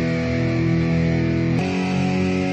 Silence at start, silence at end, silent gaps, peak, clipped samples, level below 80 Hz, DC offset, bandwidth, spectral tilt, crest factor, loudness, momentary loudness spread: 0 s; 0 s; none; -10 dBFS; under 0.1%; -38 dBFS; under 0.1%; 8.4 kHz; -7.5 dB/octave; 10 dB; -20 LUFS; 2 LU